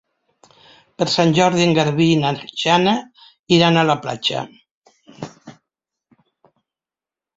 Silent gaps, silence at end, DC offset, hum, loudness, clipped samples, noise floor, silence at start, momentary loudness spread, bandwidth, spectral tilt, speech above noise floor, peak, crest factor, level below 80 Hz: 3.39-3.44 s, 4.71-4.82 s; 1.85 s; under 0.1%; none; -17 LUFS; under 0.1%; -90 dBFS; 1 s; 21 LU; 7.8 kHz; -5 dB/octave; 74 dB; -2 dBFS; 18 dB; -58 dBFS